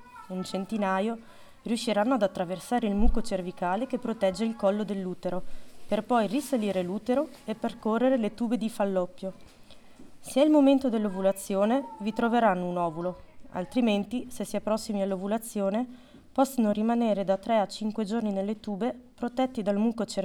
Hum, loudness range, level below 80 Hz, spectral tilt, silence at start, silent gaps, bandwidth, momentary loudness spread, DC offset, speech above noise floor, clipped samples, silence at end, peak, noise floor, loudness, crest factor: none; 4 LU; -42 dBFS; -6 dB/octave; 0 s; none; 17.5 kHz; 9 LU; under 0.1%; 20 dB; under 0.1%; 0 s; -8 dBFS; -47 dBFS; -28 LUFS; 20 dB